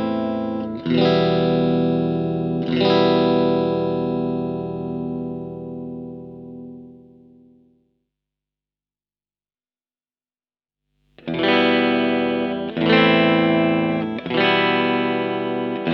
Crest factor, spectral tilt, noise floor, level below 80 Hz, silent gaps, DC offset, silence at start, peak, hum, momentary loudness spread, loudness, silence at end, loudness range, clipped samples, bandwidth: 18 dB; -8 dB/octave; under -90 dBFS; -54 dBFS; none; under 0.1%; 0 s; -4 dBFS; none; 16 LU; -19 LUFS; 0 s; 16 LU; under 0.1%; 6 kHz